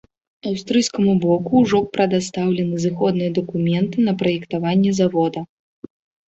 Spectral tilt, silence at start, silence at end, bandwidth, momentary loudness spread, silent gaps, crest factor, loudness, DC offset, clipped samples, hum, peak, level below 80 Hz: -6.5 dB/octave; 0.45 s; 0.85 s; 8.2 kHz; 7 LU; none; 16 dB; -19 LUFS; under 0.1%; under 0.1%; none; -4 dBFS; -56 dBFS